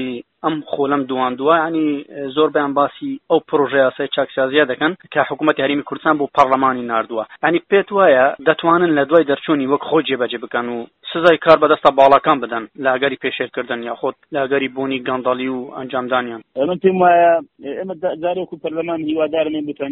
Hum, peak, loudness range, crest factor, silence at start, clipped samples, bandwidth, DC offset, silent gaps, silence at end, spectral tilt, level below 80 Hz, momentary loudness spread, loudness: none; 0 dBFS; 5 LU; 16 dB; 0 s; under 0.1%; 4.5 kHz; under 0.1%; none; 0 s; -3 dB/octave; -60 dBFS; 12 LU; -17 LUFS